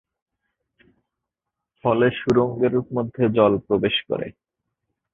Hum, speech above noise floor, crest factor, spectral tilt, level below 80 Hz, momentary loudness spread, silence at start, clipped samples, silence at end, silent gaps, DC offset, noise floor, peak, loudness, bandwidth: none; 64 dB; 20 dB; -7.5 dB/octave; -54 dBFS; 10 LU; 1.85 s; under 0.1%; 0.85 s; none; under 0.1%; -84 dBFS; -2 dBFS; -21 LUFS; 7.2 kHz